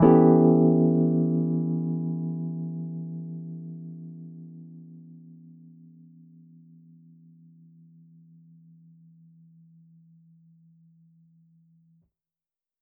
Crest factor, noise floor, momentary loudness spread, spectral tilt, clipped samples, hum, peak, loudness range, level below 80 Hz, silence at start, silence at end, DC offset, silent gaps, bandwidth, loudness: 22 dB; under -90 dBFS; 28 LU; -10 dB/octave; under 0.1%; none; -6 dBFS; 28 LU; -62 dBFS; 0 s; 7.65 s; under 0.1%; none; 2.9 kHz; -24 LUFS